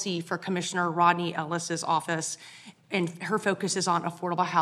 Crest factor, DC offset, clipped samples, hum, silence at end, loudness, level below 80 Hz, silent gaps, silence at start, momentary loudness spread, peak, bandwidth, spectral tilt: 22 dB; under 0.1%; under 0.1%; none; 0 s; -28 LUFS; -80 dBFS; none; 0 s; 8 LU; -6 dBFS; 13.5 kHz; -4 dB/octave